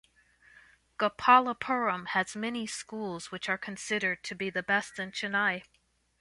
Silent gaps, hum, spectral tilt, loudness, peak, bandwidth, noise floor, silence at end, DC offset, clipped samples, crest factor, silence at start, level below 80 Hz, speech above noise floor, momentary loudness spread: none; none; -3.5 dB/octave; -30 LUFS; -8 dBFS; 11.5 kHz; -71 dBFS; 0.6 s; under 0.1%; under 0.1%; 24 dB; 1 s; -70 dBFS; 41 dB; 14 LU